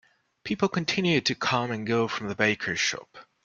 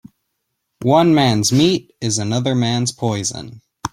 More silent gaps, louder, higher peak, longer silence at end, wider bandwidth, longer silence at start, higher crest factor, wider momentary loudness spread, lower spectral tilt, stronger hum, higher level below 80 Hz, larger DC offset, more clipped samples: neither; second, -26 LUFS vs -17 LUFS; second, -6 dBFS vs -2 dBFS; first, 0.2 s vs 0.05 s; second, 9 kHz vs 16 kHz; second, 0.45 s vs 0.8 s; first, 22 dB vs 16 dB; second, 6 LU vs 11 LU; about the same, -4 dB/octave vs -5 dB/octave; neither; second, -62 dBFS vs -52 dBFS; neither; neither